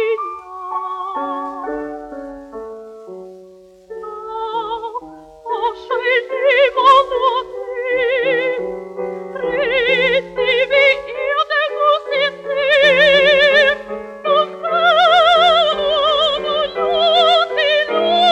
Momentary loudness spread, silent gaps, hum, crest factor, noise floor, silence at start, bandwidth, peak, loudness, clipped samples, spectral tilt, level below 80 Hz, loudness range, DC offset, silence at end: 20 LU; none; none; 14 dB; -43 dBFS; 0 s; 9.6 kHz; -2 dBFS; -15 LUFS; under 0.1%; -3 dB/octave; -52 dBFS; 15 LU; under 0.1%; 0 s